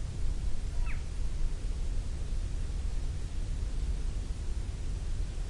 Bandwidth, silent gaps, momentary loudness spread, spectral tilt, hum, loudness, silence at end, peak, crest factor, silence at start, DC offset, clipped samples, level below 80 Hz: 11 kHz; none; 2 LU; -5.5 dB/octave; none; -38 LUFS; 0 s; -20 dBFS; 12 dB; 0 s; under 0.1%; under 0.1%; -32 dBFS